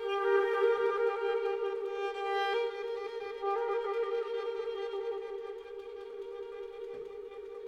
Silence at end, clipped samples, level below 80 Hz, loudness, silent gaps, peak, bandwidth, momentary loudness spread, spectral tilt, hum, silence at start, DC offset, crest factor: 0 s; under 0.1%; -72 dBFS; -34 LUFS; none; -16 dBFS; 8 kHz; 15 LU; -3.5 dB/octave; none; 0 s; under 0.1%; 18 dB